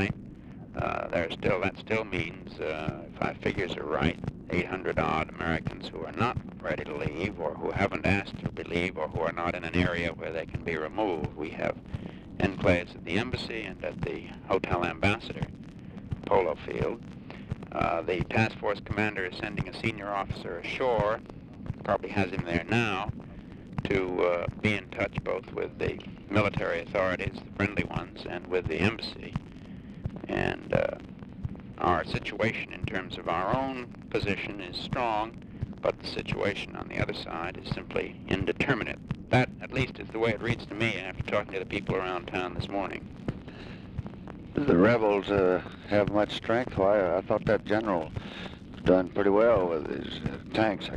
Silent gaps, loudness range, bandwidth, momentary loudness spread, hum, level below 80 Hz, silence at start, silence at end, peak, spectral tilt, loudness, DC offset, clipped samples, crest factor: none; 5 LU; 11 kHz; 13 LU; none; -48 dBFS; 0 s; 0 s; -8 dBFS; -7 dB/octave; -30 LUFS; under 0.1%; under 0.1%; 22 dB